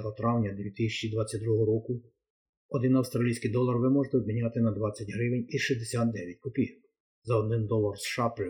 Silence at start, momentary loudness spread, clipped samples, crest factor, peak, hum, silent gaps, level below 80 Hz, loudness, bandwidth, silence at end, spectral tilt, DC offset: 0 s; 7 LU; under 0.1%; 16 dB; -14 dBFS; none; 2.30-2.69 s, 7.00-7.22 s; -60 dBFS; -30 LUFS; 17.5 kHz; 0 s; -6.5 dB/octave; under 0.1%